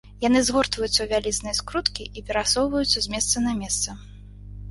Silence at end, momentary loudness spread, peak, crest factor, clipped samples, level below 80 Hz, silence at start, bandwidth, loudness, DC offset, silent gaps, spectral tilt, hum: 0 s; 9 LU; -2 dBFS; 22 dB; under 0.1%; -42 dBFS; 0.05 s; 12 kHz; -23 LUFS; under 0.1%; none; -2.5 dB/octave; 50 Hz at -40 dBFS